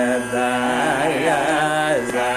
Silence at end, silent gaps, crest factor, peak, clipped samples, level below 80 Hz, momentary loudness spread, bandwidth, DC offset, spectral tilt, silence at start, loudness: 0 s; none; 14 dB; -6 dBFS; under 0.1%; -52 dBFS; 2 LU; 16 kHz; under 0.1%; -4 dB/octave; 0 s; -19 LUFS